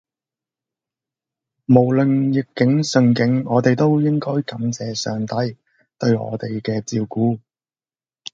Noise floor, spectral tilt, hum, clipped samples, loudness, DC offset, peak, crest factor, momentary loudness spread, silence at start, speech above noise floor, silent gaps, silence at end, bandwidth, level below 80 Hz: under -90 dBFS; -6.5 dB/octave; none; under 0.1%; -19 LUFS; under 0.1%; 0 dBFS; 20 dB; 9 LU; 1.7 s; over 72 dB; none; 0.95 s; 7.8 kHz; -60 dBFS